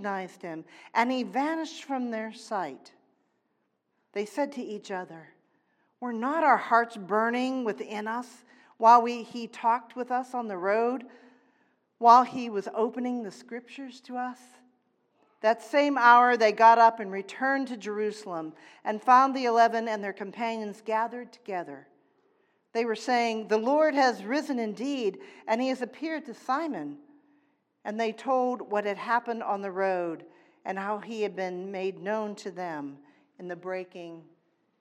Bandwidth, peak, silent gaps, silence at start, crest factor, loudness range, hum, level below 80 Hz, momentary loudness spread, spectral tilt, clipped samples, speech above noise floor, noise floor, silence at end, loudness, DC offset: 12.5 kHz; -6 dBFS; none; 0 s; 22 dB; 12 LU; none; under -90 dBFS; 18 LU; -4.5 dB/octave; under 0.1%; 49 dB; -76 dBFS; 0.6 s; -27 LUFS; under 0.1%